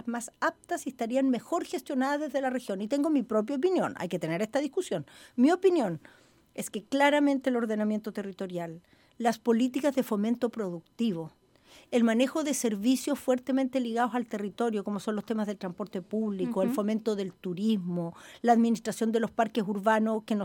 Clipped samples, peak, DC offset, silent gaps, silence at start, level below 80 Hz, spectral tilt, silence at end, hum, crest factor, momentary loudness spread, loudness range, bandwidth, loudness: under 0.1%; -10 dBFS; under 0.1%; none; 0.05 s; -74 dBFS; -5.5 dB/octave; 0 s; none; 20 dB; 11 LU; 3 LU; 17.5 kHz; -29 LUFS